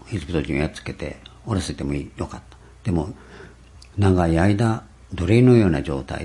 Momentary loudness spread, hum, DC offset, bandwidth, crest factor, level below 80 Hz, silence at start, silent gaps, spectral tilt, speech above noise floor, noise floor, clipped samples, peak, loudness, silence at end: 18 LU; none; under 0.1%; 11.5 kHz; 18 dB; -40 dBFS; 0.05 s; none; -7.5 dB/octave; 25 dB; -45 dBFS; under 0.1%; -2 dBFS; -21 LUFS; 0 s